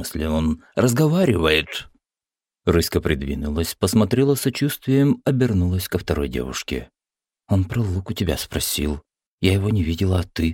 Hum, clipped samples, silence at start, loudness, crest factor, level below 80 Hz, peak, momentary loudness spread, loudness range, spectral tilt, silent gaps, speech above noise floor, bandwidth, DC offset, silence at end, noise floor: none; under 0.1%; 0 s; -21 LUFS; 18 dB; -36 dBFS; -4 dBFS; 9 LU; 4 LU; -5.5 dB/octave; 9.27-9.38 s; over 70 dB; 17 kHz; under 0.1%; 0 s; under -90 dBFS